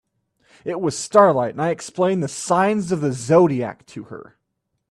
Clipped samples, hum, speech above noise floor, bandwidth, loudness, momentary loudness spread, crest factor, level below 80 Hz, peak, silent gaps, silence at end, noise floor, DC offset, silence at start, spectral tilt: under 0.1%; none; 56 dB; 12.5 kHz; -19 LUFS; 21 LU; 20 dB; -60 dBFS; 0 dBFS; none; 0.7 s; -75 dBFS; under 0.1%; 0.65 s; -6 dB/octave